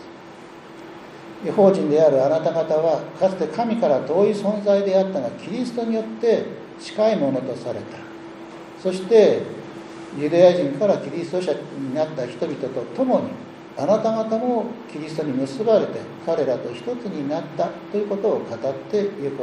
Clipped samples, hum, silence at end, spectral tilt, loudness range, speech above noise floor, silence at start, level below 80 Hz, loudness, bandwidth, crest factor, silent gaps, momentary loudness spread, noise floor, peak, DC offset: under 0.1%; none; 0 s; -7 dB/octave; 5 LU; 20 dB; 0 s; -66 dBFS; -21 LUFS; 11 kHz; 20 dB; none; 20 LU; -41 dBFS; -2 dBFS; under 0.1%